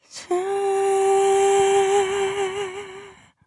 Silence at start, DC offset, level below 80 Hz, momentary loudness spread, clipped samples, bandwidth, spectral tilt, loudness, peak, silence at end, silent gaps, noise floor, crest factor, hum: 0.15 s; under 0.1%; -62 dBFS; 12 LU; under 0.1%; 11.5 kHz; -3 dB/octave; -20 LUFS; -8 dBFS; 0.35 s; none; -44 dBFS; 12 dB; none